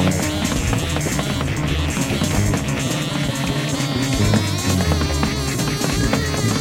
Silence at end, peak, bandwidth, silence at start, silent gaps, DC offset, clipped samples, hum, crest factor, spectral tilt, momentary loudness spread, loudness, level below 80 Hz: 0 s; -4 dBFS; 16.5 kHz; 0 s; none; under 0.1%; under 0.1%; none; 16 dB; -4.5 dB/octave; 3 LU; -20 LUFS; -30 dBFS